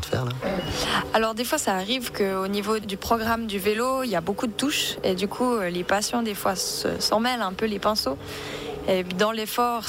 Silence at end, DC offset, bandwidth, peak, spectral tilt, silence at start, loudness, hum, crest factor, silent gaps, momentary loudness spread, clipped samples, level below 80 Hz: 0 s; under 0.1%; 18 kHz; -8 dBFS; -3.5 dB/octave; 0 s; -25 LUFS; none; 16 dB; none; 5 LU; under 0.1%; -50 dBFS